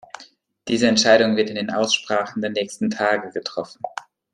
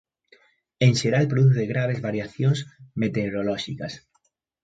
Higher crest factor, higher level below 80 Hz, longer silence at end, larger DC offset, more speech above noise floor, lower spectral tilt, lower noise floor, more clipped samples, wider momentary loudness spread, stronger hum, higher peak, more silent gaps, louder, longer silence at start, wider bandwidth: about the same, 20 dB vs 18 dB; second, -64 dBFS vs -58 dBFS; second, 0.35 s vs 0.65 s; neither; second, 29 dB vs 48 dB; second, -3.5 dB/octave vs -6.5 dB/octave; second, -50 dBFS vs -70 dBFS; neither; first, 18 LU vs 14 LU; neither; first, -2 dBFS vs -6 dBFS; neither; first, -20 LUFS vs -23 LUFS; second, 0.2 s vs 0.8 s; first, 11.5 kHz vs 9.2 kHz